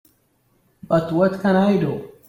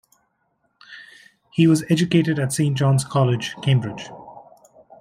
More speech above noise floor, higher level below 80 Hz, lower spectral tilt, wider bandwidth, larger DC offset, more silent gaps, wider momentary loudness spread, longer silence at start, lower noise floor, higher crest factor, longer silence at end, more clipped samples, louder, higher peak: second, 45 dB vs 50 dB; about the same, -56 dBFS vs -60 dBFS; first, -8.5 dB/octave vs -6 dB/octave; second, 13 kHz vs 15 kHz; neither; neither; second, 5 LU vs 23 LU; about the same, 0.9 s vs 0.9 s; second, -63 dBFS vs -69 dBFS; about the same, 16 dB vs 18 dB; second, 0.2 s vs 0.6 s; neither; about the same, -19 LUFS vs -20 LUFS; about the same, -6 dBFS vs -4 dBFS